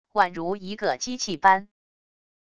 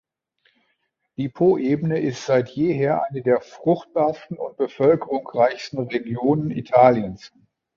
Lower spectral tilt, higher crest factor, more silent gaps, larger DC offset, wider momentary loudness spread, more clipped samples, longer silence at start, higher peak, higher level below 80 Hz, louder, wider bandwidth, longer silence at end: second, -3 dB/octave vs -7.5 dB/octave; about the same, 22 dB vs 20 dB; neither; first, 0.4% vs under 0.1%; second, 10 LU vs 13 LU; neither; second, 0.15 s vs 1.2 s; about the same, -4 dBFS vs -2 dBFS; about the same, -62 dBFS vs -60 dBFS; second, -24 LUFS vs -21 LUFS; first, 10 kHz vs 7.4 kHz; first, 0.75 s vs 0.5 s